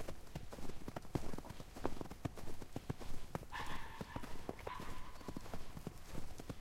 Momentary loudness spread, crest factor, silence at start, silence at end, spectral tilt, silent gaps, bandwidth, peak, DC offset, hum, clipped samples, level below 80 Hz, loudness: 6 LU; 20 dB; 0 s; 0 s; -5.5 dB/octave; none; 15.5 kHz; -22 dBFS; under 0.1%; none; under 0.1%; -50 dBFS; -49 LUFS